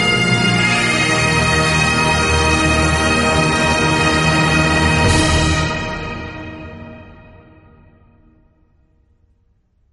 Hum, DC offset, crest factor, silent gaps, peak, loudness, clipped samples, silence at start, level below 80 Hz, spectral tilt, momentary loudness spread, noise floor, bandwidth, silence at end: none; under 0.1%; 14 dB; none; -2 dBFS; -14 LUFS; under 0.1%; 0 s; -28 dBFS; -4 dB/octave; 14 LU; -59 dBFS; 11.5 kHz; 2.8 s